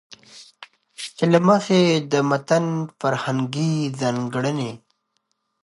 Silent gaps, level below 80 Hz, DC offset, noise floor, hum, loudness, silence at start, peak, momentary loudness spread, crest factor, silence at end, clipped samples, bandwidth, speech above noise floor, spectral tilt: none; -68 dBFS; under 0.1%; -72 dBFS; none; -21 LUFS; 0.35 s; -2 dBFS; 17 LU; 18 dB; 0.85 s; under 0.1%; 11.5 kHz; 52 dB; -6 dB/octave